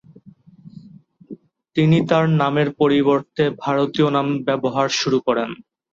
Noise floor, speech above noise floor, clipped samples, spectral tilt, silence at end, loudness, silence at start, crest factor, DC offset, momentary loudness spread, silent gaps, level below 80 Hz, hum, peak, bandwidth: -47 dBFS; 29 dB; under 0.1%; -6 dB/octave; 0.4 s; -19 LUFS; 0.25 s; 16 dB; under 0.1%; 6 LU; none; -60 dBFS; none; -4 dBFS; 7.6 kHz